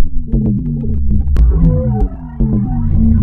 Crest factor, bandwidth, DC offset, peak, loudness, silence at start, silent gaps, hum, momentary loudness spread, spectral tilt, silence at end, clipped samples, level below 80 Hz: 10 dB; 2.2 kHz; under 0.1%; 0 dBFS; -15 LUFS; 0 s; none; none; 6 LU; -12 dB/octave; 0 s; under 0.1%; -14 dBFS